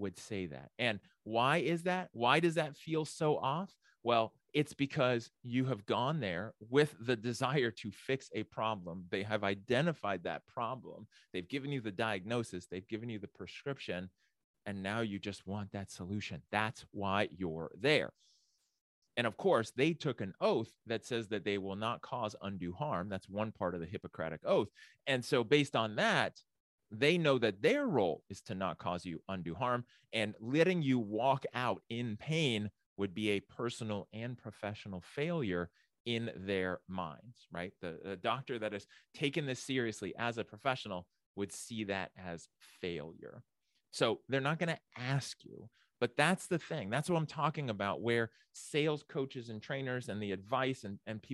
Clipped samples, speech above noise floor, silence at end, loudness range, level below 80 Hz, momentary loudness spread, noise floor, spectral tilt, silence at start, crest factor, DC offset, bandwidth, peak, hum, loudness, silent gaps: under 0.1%; 39 dB; 0 s; 7 LU; -74 dBFS; 13 LU; -76 dBFS; -5.5 dB/octave; 0 s; 24 dB; under 0.1%; 12.5 kHz; -12 dBFS; none; -36 LUFS; 14.44-14.54 s, 18.81-19.02 s, 26.60-26.78 s, 32.86-32.96 s, 36.00-36.05 s, 41.26-41.34 s